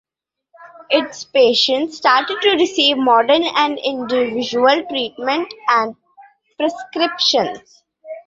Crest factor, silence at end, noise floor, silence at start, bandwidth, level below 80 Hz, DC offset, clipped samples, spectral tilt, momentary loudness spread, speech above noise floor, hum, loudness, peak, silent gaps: 16 dB; 0.05 s; -77 dBFS; 0.6 s; 7.8 kHz; -64 dBFS; under 0.1%; under 0.1%; -2.5 dB/octave; 9 LU; 61 dB; none; -16 LUFS; -2 dBFS; none